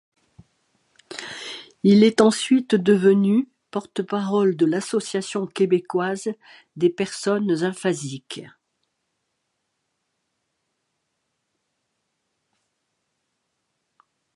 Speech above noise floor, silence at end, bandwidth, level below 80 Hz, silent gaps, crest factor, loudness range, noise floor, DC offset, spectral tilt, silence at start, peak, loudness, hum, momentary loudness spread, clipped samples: 56 dB; 5.9 s; 11.5 kHz; -70 dBFS; none; 22 dB; 9 LU; -76 dBFS; under 0.1%; -5.5 dB/octave; 1.1 s; -2 dBFS; -21 LUFS; none; 17 LU; under 0.1%